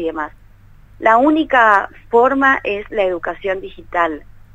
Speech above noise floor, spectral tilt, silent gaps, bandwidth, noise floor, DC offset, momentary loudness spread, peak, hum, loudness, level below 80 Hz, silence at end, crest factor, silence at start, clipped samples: 28 dB; -5.5 dB/octave; none; 8 kHz; -43 dBFS; under 0.1%; 12 LU; 0 dBFS; none; -15 LUFS; -44 dBFS; 0.35 s; 16 dB; 0 s; under 0.1%